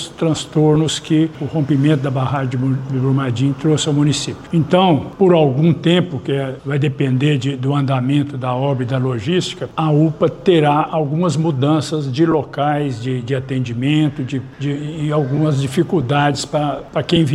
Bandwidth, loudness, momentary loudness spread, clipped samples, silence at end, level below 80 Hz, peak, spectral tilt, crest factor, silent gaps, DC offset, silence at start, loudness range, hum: 11.5 kHz; -17 LUFS; 7 LU; under 0.1%; 0 s; -48 dBFS; 0 dBFS; -6.5 dB/octave; 16 dB; none; under 0.1%; 0 s; 3 LU; none